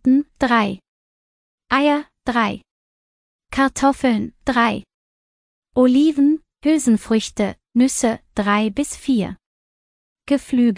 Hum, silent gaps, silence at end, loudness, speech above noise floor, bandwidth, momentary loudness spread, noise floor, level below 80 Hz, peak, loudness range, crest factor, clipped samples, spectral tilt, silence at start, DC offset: none; 0.89-1.58 s, 2.71-3.39 s, 4.94-5.62 s, 9.46-10.16 s; 0 s; -19 LUFS; over 73 dB; 10.5 kHz; 8 LU; under -90 dBFS; -48 dBFS; -4 dBFS; 4 LU; 16 dB; under 0.1%; -4.5 dB/octave; 0.05 s; under 0.1%